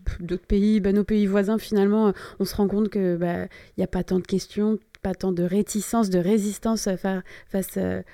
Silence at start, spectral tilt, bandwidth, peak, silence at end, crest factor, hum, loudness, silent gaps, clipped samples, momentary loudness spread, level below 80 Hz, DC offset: 0.05 s; -6.5 dB/octave; 16 kHz; -8 dBFS; 0.1 s; 14 dB; none; -24 LUFS; none; under 0.1%; 9 LU; -40 dBFS; under 0.1%